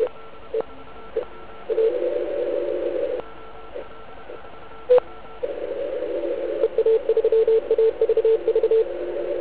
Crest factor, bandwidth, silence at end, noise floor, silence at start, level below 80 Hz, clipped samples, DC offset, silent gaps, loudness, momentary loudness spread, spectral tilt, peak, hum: 16 dB; 4 kHz; 0 s; -42 dBFS; 0 s; -54 dBFS; under 0.1%; 1%; none; -23 LUFS; 21 LU; -9 dB/octave; -6 dBFS; none